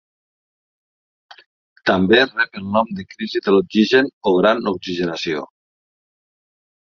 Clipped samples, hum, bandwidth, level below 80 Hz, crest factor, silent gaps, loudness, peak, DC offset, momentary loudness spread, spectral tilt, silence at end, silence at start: under 0.1%; none; 7.2 kHz; -54 dBFS; 18 dB; 1.46-1.76 s, 4.13-4.21 s; -18 LUFS; -2 dBFS; under 0.1%; 11 LU; -6 dB/octave; 1.4 s; 1.3 s